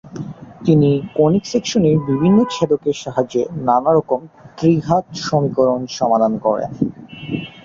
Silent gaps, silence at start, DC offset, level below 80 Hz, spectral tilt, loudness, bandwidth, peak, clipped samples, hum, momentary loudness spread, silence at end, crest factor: none; 0.05 s; under 0.1%; -50 dBFS; -7 dB/octave; -17 LUFS; 7.6 kHz; -2 dBFS; under 0.1%; none; 9 LU; 0.05 s; 16 dB